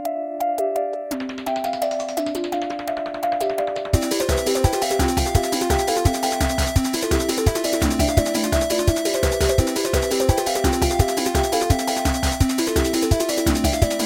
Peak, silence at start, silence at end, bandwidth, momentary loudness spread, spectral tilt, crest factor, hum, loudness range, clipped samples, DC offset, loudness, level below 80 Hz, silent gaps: -2 dBFS; 0 s; 0 s; 17 kHz; 6 LU; -4.5 dB/octave; 20 dB; none; 4 LU; under 0.1%; under 0.1%; -21 LUFS; -28 dBFS; none